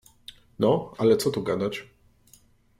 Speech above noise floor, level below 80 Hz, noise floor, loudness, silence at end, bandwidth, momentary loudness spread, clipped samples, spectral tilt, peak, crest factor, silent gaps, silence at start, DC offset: 35 dB; -62 dBFS; -58 dBFS; -25 LUFS; 0.95 s; 16 kHz; 24 LU; under 0.1%; -6 dB/octave; -8 dBFS; 18 dB; none; 0.3 s; under 0.1%